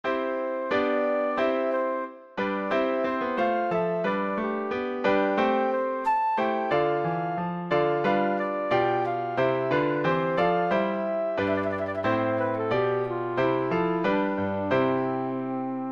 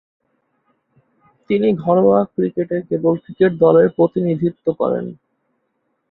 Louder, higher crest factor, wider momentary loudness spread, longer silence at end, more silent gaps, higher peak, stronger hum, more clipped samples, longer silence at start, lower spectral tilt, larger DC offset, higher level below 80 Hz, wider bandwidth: second, -26 LUFS vs -17 LUFS; about the same, 16 dB vs 16 dB; second, 5 LU vs 9 LU; second, 0 s vs 0.95 s; neither; second, -10 dBFS vs -2 dBFS; neither; neither; second, 0.05 s vs 1.5 s; second, -8 dB/octave vs -12 dB/octave; neither; about the same, -62 dBFS vs -58 dBFS; first, 7.2 kHz vs 4.2 kHz